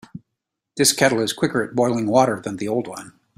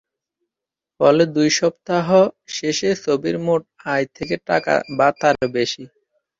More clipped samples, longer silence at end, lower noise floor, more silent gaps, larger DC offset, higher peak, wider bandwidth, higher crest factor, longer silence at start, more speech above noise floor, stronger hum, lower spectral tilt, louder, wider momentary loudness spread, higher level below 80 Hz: neither; second, 0.3 s vs 0.55 s; second, -81 dBFS vs -87 dBFS; neither; neither; about the same, -2 dBFS vs -2 dBFS; first, 16 kHz vs 7.8 kHz; about the same, 20 dB vs 18 dB; second, 0.15 s vs 1 s; second, 61 dB vs 69 dB; neither; about the same, -3.5 dB/octave vs -4.5 dB/octave; about the same, -20 LUFS vs -19 LUFS; first, 14 LU vs 8 LU; about the same, -60 dBFS vs -58 dBFS